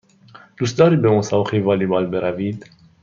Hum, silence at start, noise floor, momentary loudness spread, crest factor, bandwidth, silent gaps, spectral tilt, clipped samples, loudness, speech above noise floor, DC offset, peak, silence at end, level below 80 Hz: none; 0.35 s; -46 dBFS; 11 LU; 16 dB; 7.4 kHz; none; -7 dB/octave; under 0.1%; -18 LUFS; 29 dB; under 0.1%; -2 dBFS; 0.45 s; -58 dBFS